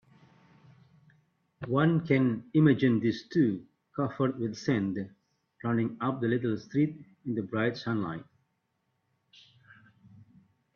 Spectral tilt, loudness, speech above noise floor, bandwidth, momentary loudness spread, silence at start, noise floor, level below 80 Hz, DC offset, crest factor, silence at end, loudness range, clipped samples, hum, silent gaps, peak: -8 dB/octave; -29 LUFS; 50 dB; 7 kHz; 13 LU; 1.6 s; -78 dBFS; -68 dBFS; under 0.1%; 20 dB; 2.55 s; 9 LU; under 0.1%; none; none; -12 dBFS